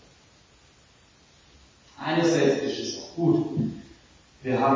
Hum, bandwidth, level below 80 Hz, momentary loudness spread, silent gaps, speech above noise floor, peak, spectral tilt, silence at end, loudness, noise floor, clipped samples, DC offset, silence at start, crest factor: none; 7.6 kHz; -62 dBFS; 13 LU; none; 34 dB; -10 dBFS; -5.5 dB/octave; 0 s; -26 LUFS; -57 dBFS; under 0.1%; under 0.1%; 2 s; 18 dB